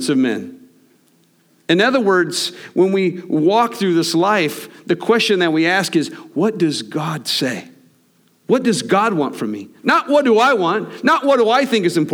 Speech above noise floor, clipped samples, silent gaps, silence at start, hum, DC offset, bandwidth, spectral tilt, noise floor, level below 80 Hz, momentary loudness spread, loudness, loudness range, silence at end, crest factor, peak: 41 dB; under 0.1%; none; 0 s; none; under 0.1%; 19.5 kHz; -4.5 dB/octave; -57 dBFS; -72 dBFS; 9 LU; -16 LUFS; 4 LU; 0 s; 16 dB; -2 dBFS